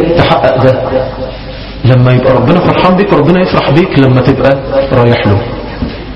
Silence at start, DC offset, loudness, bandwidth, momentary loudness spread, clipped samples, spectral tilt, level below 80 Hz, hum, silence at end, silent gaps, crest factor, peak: 0 s; under 0.1%; -8 LUFS; 6 kHz; 12 LU; 1%; -9 dB/octave; -26 dBFS; none; 0 s; none; 8 dB; 0 dBFS